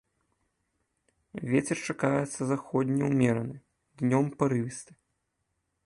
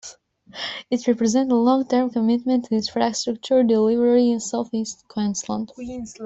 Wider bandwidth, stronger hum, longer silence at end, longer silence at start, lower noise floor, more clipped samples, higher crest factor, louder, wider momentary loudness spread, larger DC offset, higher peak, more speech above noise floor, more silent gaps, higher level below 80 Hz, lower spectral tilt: first, 11.5 kHz vs 8 kHz; neither; first, 1 s vs 0 s; first, 1.35 s vs 0.05 s; first, -79 dBFS vs -45 dBFS; neither; about the same, 20 dB vs 16 dB; second, -29 LUFS vs -21 LUFS; about the same, 14 LU vs 13 LU; neither; second, -10 dBFS vs -6 dBFS; first, 51 dB vs 25 dB; neither; second, -66 dBFS vs -60 dBFS; first, -6.5 dB/octave vs -4.5 dB/octave